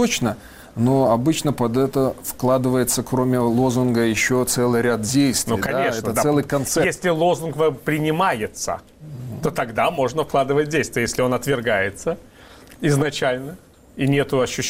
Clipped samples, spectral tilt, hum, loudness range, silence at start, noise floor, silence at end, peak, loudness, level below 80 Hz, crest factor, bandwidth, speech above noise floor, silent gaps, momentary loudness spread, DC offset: under 0.1%; -5 dB/octave; none; 3 LU; 0 s; -44 dBFS; 0 s; -8 dBFS; -20 LUFS; -48 dBFS; 12 dB; 16 kHz; 25 dB; none; 8 LU; under 0.1%